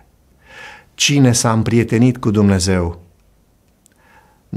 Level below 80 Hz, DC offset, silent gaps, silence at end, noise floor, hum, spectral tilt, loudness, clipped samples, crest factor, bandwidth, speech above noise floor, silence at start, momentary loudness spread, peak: -42 dBFS; under 0.1%; none; 0 s; -55 dBFS; none; -5 dB/octave; -14 LUFS; under 0.1%; 16 dB; 15 kHz; 42 dB; 0.55 s; 24 LU; -2 dBFS